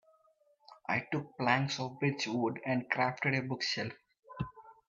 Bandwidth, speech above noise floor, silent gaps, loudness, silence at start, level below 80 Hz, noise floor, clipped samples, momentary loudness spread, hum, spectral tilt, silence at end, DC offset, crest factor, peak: 7.8 kHz; 36 dB; 4.19-4.23 s; -34 LUFS; 0.7 s; -68 dBFS; -70 dBFS; under 0.1%; 12 LU; none; -5 dB/octave; 0.15 s; under 0.1%; 22 dB; -12 dBFS